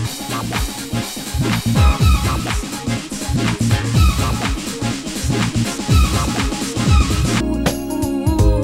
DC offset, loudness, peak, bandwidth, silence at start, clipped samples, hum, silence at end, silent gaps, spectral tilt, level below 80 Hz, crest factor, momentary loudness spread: under 0.1%; -18 LUFS; -2 dBFS; 16.5 kHz; 0 s; under 0.1%; none; 0 s; none; -5 dB/octave; -22 dBFS; 16 dB; 8 LU